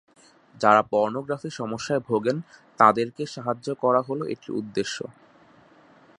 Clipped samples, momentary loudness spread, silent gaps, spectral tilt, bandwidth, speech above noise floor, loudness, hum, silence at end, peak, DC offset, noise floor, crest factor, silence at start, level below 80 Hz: under 0.1%; 13 LU; none; -5.5 dB/octave; 11 kHz; 31 dB; -24 LUFS; none; 1.05 s; -2 dBFS; under 0.1%; -55 dBFS; 24 dB; 0.55 s; -68 dBFS